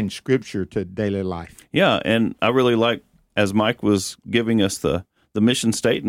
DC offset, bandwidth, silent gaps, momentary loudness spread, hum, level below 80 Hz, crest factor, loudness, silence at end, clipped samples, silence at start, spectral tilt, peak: under 0.1%; 16 kHz; none; 10 LU; none; -50 dBFS; 18 dB; -21 LUFS; 0 s; under 0.1%; 0 s; -5 dB/octave; -4 dBFS